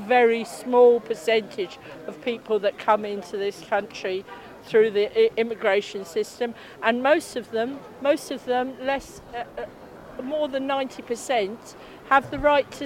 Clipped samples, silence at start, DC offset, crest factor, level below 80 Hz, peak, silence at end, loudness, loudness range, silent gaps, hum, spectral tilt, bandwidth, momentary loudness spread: under 0.1%; 0 s; under 0.1%; 20 dB; -56 dBFS; -4 dBFS; 0 s; -24 LUFS; 5 LU; none; none; -4 dB/octave; 15.5 kHz; 16 LU